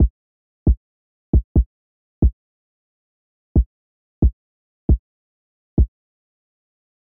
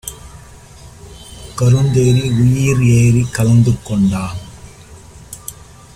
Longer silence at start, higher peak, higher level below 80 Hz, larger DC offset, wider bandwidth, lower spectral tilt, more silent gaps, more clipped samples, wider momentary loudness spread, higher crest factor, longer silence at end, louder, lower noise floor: about the same, 0 s vs 0.05 s; second, -8 dBFS vs -2 dBFS; first, -24 dBFS vs -36 dBFS; neither; second, 1.2 kHz vs 14.5 kHz; first, -16 dB/octave vs -6.5 dB/octave; first, 0.10-0.66 s, 0.77-1.33 s, 1.44-1.55 s, 1.66-2.22 s, 2.33-3.55 s, 3.66-4.22 s, 4.33-4.89 s, 4.99-5.77 s vs none; neither; second, 5 LU vs 19 LU; about the same, 14 dB vs 14 dB; first, 1.25 s vs 0.45 s; second, -22 LUFS vs -13 LUFS; first, under -90 dBFS vs -38 dBFS